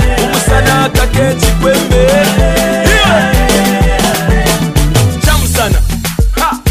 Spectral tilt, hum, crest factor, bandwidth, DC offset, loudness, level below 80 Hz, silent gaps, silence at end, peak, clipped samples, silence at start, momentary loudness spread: -4.5 dB/octave; none; 8 dB; 16 kHz; under 0.1%; -10 LUFS; -14 dBFS; none; 0 s; 0 dBFS; under 0.1%; 0 s; 4 LU